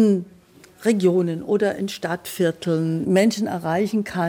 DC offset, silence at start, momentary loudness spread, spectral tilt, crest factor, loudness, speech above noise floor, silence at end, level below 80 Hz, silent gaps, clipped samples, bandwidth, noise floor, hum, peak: under 0.1%; 0 s; 8 LU; -6 dB/octave; 16 dB; -22 LUFS; 29 dB; 0 s; -64 dBFS; none; under 0.1%; 16.5 kHz; -50 dBFS; none; -6 dBFS